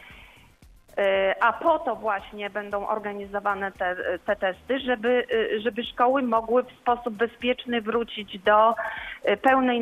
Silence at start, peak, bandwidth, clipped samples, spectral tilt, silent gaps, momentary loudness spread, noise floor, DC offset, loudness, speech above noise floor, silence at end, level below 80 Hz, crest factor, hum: 0.05 s; -8 dBFS; 14 kHz; under 0.1%; -5.5 dB/octave; none; 9 LU; -53 dBFS; under 0.1%; -25 LUFS; 29 dB; 0 s; -56 dBFS; 18 dB; none